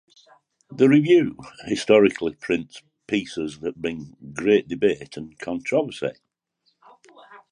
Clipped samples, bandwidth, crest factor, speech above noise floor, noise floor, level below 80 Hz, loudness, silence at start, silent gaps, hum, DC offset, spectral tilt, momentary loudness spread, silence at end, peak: under 0.1%; 10.5 kHz; 20 dB; 48 dB; -70 dBFS; -60 dBFS; -22 LUFS; 0.7 s; none; none; under 0.1%; -6 dB/octave; 19 LU; 0.15 s; -4 dBFS